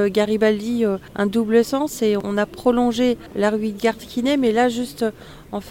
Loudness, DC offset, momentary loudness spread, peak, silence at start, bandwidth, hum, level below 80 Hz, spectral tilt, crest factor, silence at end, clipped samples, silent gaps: -20 LUFS; under 0.1%; 6 LU; -4 dBFS; 0 s; 17 kHz; none; -50 dBFS; -5.5 dB/octave; 16 dB; 0 s; under 0.1%; none